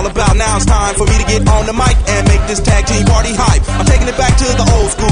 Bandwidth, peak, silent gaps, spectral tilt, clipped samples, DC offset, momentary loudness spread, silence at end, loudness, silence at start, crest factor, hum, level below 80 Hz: 10.5 kHz; 0 dBFS; none; -4.5 dB/octave; under 0.1%; under 0.1%; 1 LU; 0 s; -12 LUFS; 0 s; 10 dB; none; -14 dBFS